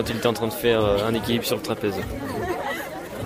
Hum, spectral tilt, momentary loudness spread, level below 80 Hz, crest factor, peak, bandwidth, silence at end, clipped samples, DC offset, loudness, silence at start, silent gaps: none; -5 dB/octave; 9 LU; -44 dBFS; 18 dB; -6 dBFS; 16 kHz; 0 s; under 0.1%; under 0.1%; -24 LUFS; 0 s; none